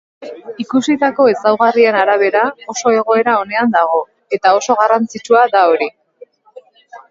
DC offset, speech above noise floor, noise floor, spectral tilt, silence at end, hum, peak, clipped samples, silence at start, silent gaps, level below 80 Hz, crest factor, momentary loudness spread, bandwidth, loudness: under 0.1%; 30 dB; -43 dBFS; -4 dB/octave; 0.15 s; none; 0 dBFS; under 0.1%; 0.2 s; none; -64 dBFS; 14 dB; 9 LU; 7.8 kHz; -13 LUFS